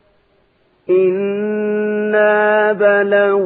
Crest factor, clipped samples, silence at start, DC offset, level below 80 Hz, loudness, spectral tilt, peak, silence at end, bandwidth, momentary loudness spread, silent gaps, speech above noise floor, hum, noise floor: 14 dB; under 0.1%; 0.9 s; under 0.1%; -68 dBFS; -14 LUFS; -10 dB/octave; -2 dBFS; 0 s; 4.1 kHz; 7 LU; none; 44 dB; none; -57 dBFS